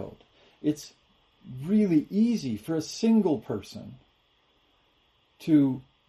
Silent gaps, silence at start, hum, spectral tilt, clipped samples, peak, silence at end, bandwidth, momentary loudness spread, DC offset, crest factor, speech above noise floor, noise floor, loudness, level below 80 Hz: none; 0 s; none; -7 dB/octave; under 0.1%; -12 dBFS; 0.25 s; 13 kHz; 20 LU; under 0.1%; 16 dB; 41 dB; -67 dBFS; -26 LUFS; -66 dBFS